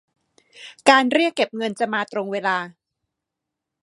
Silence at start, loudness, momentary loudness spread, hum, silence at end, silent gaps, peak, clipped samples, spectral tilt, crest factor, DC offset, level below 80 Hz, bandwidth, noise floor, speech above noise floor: 0.6 s; -20 LUFS; 11 LU; none; 1.15 s; none; 0 dBFS; under 0.1%; -3.5 dB/octave; 22 dB; under 0.1%; -76 dBFS; 11.5 kHz; -83 dBFS; 63 dB